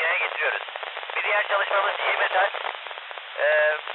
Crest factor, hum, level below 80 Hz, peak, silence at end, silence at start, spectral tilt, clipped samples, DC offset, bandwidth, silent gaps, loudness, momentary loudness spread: 14 dB; none; under -90 dBFS; -12 dBFS; 0 s; 0 s; -2.5 dB/octave; under 0.1%; under 0.1%; 4.3 kHz; none; -23 LUFS; 12 LU